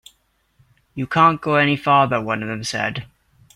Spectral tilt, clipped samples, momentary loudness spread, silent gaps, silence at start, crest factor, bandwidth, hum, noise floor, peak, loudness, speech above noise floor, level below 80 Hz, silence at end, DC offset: -5 dB/octave; under 0.1%; 13 LU; none; 0.95 s; 18 dB; 15.5 kHz; none; -63 dBFS; -2 dBFS; -18 LUFS; 44 dB; -56 dBFS; 0.5 s; under 0.1%